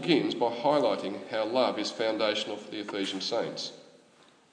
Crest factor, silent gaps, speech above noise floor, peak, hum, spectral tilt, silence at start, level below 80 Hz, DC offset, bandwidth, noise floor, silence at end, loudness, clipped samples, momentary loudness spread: 20 dB; none; 31 dB; -10 dBFS; none; -4.5 dB/octave; 0 s; -88 dBFS; under 0.1%; 10 kHz; -60 dBFS; 0.7 s; -30 LUFS; under 0.1%; 10 LU